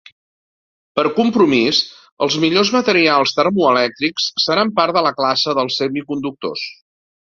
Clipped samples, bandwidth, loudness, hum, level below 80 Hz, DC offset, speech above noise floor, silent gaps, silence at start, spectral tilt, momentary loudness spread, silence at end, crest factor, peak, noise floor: under 0.1%; 7.6 kHz; -16 LUFS; none; -60 dBFS; under 0.1%; over 74 dB; 2.12-2.17 s; 0.95 s; -4 dB/octave; 11 LU; 0.65 s; 16 dB; 0 dBFS; under -90 dBFS